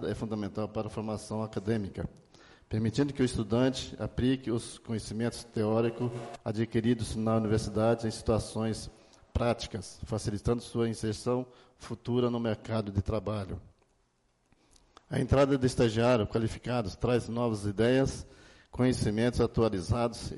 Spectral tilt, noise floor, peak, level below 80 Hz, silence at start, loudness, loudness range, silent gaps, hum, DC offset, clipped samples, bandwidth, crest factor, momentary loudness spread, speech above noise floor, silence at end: -6.5 dB/octave; -72 dBFS; -14 dBFS; -48 dBFS; 0 s; -31 LUFS; 5 LU; none; none; under 0.1%; under 0.1%; 11.5 kHz; 16 dB; 11 LU; 42 dB; 0 s